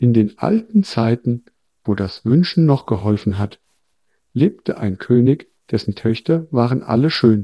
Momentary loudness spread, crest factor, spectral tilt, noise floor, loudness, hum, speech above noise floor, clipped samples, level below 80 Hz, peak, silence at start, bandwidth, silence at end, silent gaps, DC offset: 9 LU; 18 dB; -8.5 dB/octave; -71 dBFS; -18 LUFS; none; 54 dB; under 0.1%; -52 dBFS; 0 dBFS; 0 s; 11 kHz; 0 s; none; under 0.1%